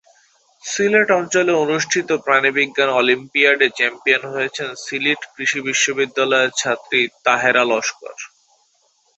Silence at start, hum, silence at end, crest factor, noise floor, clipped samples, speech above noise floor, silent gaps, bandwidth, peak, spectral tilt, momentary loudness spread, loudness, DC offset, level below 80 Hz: 0.65 s; none; 0.9 s; 18 dB; -61 dBFS; under 0.1%; 43 dB; none; 8.2 kHz; -2 dBFS; -2 dB/octave; 10 LU; -17 LUFS; under 0.1%; -66 dBFS